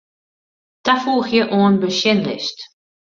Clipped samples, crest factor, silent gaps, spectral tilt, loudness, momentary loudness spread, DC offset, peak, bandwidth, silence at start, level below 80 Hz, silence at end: under 0.1%; 18 dB; none; -5 dB/octave; -17 LUFS; 10 LU; under 0.1%; 0 dBFS; 7.4 kHz; 0.85 s; -60 dBFS; 0.4 s